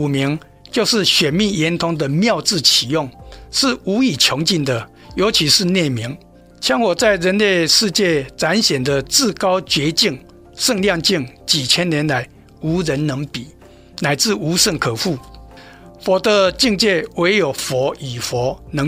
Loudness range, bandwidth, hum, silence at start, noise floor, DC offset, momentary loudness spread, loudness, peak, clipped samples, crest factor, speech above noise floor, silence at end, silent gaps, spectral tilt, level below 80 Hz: 4 LU; 16 kHz; none; 0 s; -40 dBFS; under 0.1%; 10 LU; -16 LUFS; 0 dBFS; under 0.1%; 18 dB; 23 dB; 0 s; none; -3.5 dB/octave; -44 dBFS